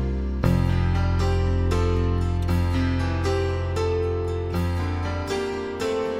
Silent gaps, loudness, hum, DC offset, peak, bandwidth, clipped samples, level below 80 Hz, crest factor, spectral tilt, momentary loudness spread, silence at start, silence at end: none; -24 LUFS; none; under 0.1%; -8 dBFS; 12 kHz; under 0.1%; -30 dBFS; 14 dB; -7 dB/octave; 4 LU; 0 s; 0 s